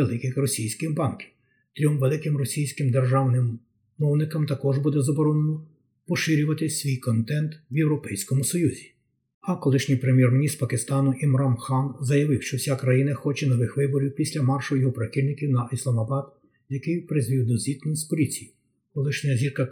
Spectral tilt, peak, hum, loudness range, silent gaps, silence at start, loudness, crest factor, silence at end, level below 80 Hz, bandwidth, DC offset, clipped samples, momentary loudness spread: -6.5 dB/octave; -8 dBFS; none; 3 LU; 9.34-9.41 s; 0 s; -24 LUFS; 16 dB; 0 s; -66 dBFS; 19.5 kHz; under 0.1%; under 0.1%; 7 LU